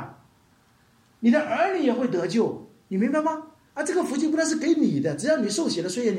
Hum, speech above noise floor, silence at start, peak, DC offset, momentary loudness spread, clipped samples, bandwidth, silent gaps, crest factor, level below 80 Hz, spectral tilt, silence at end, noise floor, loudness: none; 37 dB; 0 s; -10 dBFS; under 0.1%; 9 LU; under 0.1%; 13.5 kHz; none; 14 dB; -72 dBFS; -5 dB/octave; 0 s; -60 dBFS; -24 LUFS